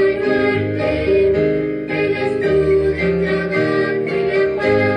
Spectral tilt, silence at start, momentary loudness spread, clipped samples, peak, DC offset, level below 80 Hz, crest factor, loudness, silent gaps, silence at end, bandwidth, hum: -7.5 dB/octave; 0 s; 4 LU; under 0.1%; -4 dBFS; under 0.1%; -38 dBFS; 12 dB; -17 LUFS; none; 0 s; 9.2 kHz; none